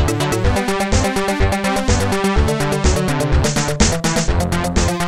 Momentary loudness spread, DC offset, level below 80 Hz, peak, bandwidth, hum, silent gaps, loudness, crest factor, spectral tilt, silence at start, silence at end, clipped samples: 2 LU; 2%; -22 dBFS; -2 dBFS; 15.5 kHz; none; none; -17 LUFS; 14 dB; -4.5 dB/octave; 0 s; 0 s; under 0.1%